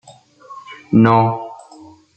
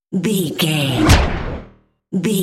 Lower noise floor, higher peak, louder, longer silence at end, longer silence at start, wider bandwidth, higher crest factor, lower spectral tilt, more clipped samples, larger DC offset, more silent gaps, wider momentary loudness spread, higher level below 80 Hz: about the same, -43 dBFS vs -46 dBFS; about the same, -2 dBFS vs 0 dBFS; about the same, -15 LUFS vs -17 LUFS; first, 0.6 s vs 0 s; first, 0.5 s vs 0.1 s; second, 8.6 kHz vs 16.5 kHz; about the same, 16 dB vs 16 dB; first, -9 dB/octave vs -5 dB/octave; neither; neither; neither; first, 24 LU vs 13 LU; second, -56 dBFS vs -26 dBFS